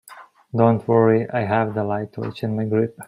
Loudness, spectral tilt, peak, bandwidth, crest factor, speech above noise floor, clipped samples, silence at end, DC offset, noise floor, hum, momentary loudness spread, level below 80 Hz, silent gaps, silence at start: -21 LUFS; -8.5 dB/octave; -2 dBFS; 15.5 kHz; 18 dB; 26 dB; under 0.1%; 0.05 s; under 0.1%; -45 dBFS; none; 11 LU; -62 dBFS; none; 0.1 s